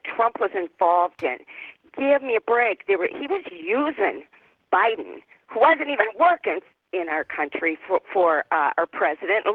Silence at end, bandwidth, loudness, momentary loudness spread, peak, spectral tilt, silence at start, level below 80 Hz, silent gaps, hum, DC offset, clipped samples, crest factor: 0 s; 4.7 kHz; -22 LUFS; 12 LU; -4 dBFS; -6 dB/octave; 0.05 s; -72 dBFS; none; none; under 0.1%; under 0.1%; 20 dB